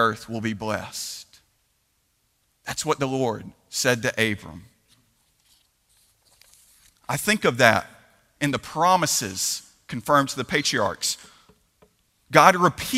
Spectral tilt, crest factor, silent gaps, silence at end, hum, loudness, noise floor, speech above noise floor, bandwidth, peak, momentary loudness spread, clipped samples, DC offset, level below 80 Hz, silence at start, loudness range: -3.5 dB/octave; 26 dB; none; 0 s; none; -22 LUFS; -69 dBFS; 47 dB; 16 kHz; 0 dBFS; 16 LU; under 0.1%; under 0.1%; -58 dBFS; 0 s; 8 LU